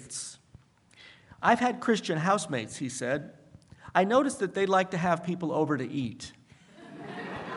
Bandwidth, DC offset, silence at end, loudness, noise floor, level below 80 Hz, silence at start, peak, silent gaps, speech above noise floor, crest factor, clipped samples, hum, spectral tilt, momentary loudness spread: 11.5 kHz; under 0.1%; 0 s; -28 LUFS; -58 dBFS; -68 dBFS; 0 s; -8 dBFS; none; 30 dB; 22 dB; under 0.1%; none; -5 dB/octave; 17 LU